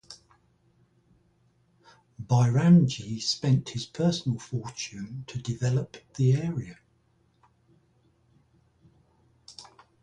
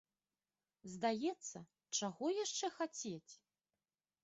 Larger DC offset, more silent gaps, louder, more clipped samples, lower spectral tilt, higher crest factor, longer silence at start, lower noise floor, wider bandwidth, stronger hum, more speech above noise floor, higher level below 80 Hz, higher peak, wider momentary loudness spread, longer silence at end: neither; neither; first, -26 LUFS vs -42 LUFS; neither; first, -6.5 dB/octave vs -3 dB/octave; about the same, 20 dB vs 20 dB; second, 0.1 s vs 0.85 s; second, -67 dBFS vs under -90 dBFS; first, 9.4 kHz vs 8.2 kHz; neither; second, 41 dB vs over 48 dB; first, -60 dBFS vs -86 dBFS; first, -10 dBFS vs -26 dBFS; first, 26 LU vs 16 LU; second, 0.4 s vs 0.9 s